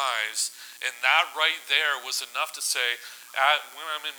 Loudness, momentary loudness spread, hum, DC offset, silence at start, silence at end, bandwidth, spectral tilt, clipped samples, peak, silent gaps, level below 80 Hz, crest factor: -25 LUFS; 11 LU; 60 Hz at -80 dBFS; under 0.1%; 0 s; 0 s; over 20 kHz; 4.5 dB/octave; under 0.1%; -6 dBFS; none; under -90 dBFS; 22 dB